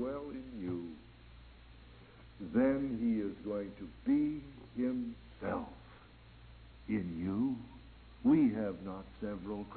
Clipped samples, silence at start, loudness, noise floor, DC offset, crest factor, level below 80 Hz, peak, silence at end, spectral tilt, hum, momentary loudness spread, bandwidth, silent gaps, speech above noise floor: under 0.1%; 0 s; -36 LUFS; -57 dBFS; under 0.1%; 18 dB; -58 dBFS; -18 dBFS; 0 s; -7.5 dB/octave; none; 24 LU; 4.5 kHz; none; 23 dB